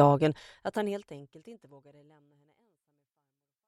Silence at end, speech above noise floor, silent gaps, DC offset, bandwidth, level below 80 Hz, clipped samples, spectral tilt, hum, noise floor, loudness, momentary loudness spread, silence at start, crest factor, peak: 2.15 s; 55 dB; none; under 0.1%; 12.5 kHz; -70 dBFS; under 0.1%; -8 dB/octave; none; -86 dBFS; -30 LUFS; 25 LU; 0 s; 22 dB; -10 dBFS